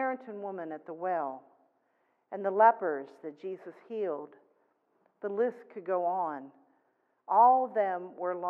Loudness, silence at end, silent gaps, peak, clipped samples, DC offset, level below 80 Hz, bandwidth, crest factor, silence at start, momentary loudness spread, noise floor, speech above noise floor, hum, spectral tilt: -30 LUFS; 0 s; none; -10 dBFS; under 0.1%; under 0.1%; under -90 dBFS; 4.6 kHz; 22 dB; 0 s; 19 LU; -74 dBFS; 44 dB; none; -8.5 dB/octave